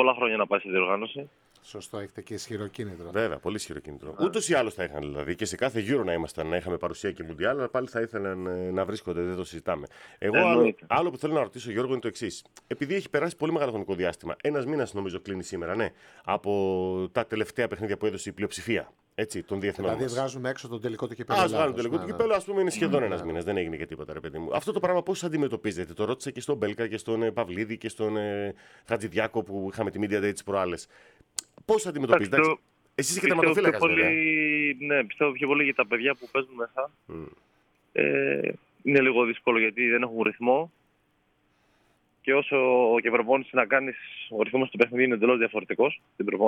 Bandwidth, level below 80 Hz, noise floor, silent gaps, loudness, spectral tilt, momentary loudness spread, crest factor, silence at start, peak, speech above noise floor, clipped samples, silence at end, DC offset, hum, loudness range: 16.5 kHz; -60 dBFS; -69 dBFS; none; -27 LUFS; -5 dB/octave; 13 LU; 22 dB; 0 s; -6 dBFS; 42 dB; under 0.1%; 0 s; under 0.1%; none; 7 LU